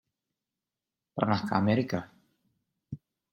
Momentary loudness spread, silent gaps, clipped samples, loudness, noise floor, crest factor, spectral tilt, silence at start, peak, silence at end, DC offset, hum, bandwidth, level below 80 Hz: 19 LU; none; under 0.1%; -29 LUFS; -90 dBFS; 26 dB; -7.5 dB/octave; 1.15 s; -8 dBFS; 0.35 s; under 0.1%; none; 12 kHz; -68 dBFS